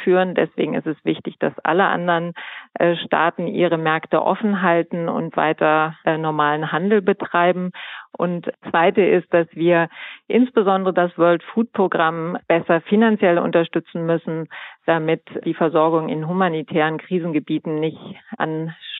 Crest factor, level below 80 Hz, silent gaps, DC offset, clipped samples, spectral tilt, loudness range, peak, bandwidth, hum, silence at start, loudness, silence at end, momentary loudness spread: 16 dB; -76 dBFS; none; under 0.1%; under 0.1%; -11 dB/octave; 3 LU; -4 dBFS; 4.1 kHz; none; 0 s; -19 LUFS; 0 s; 9 LU